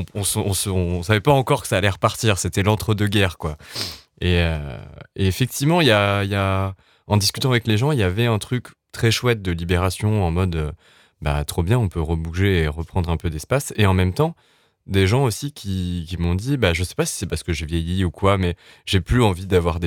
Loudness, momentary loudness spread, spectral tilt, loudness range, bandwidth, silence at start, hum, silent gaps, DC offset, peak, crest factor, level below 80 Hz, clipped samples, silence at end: -21 LUFS; 9 LU; -5 dB/octave; 3 LU; 17.5 kHz; 0 s; none; none; under 0.1%; 0 dBFS; 20 dB; -38 dBFS; under 0.1%; 0 s